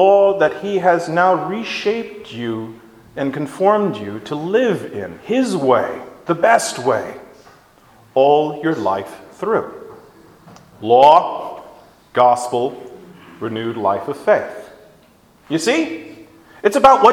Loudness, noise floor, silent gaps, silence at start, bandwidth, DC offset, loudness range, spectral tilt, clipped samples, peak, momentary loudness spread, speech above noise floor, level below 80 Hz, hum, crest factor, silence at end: -17 LUFS; -51 dBFS; none; 0 s; 16.5 kHz; under 0.1%; 5 LU; -5 dB/octave; under 0.1%; 0 dBFS; 18 LU; 35 dB; -58 dBFS; none; 18 dB; 0 s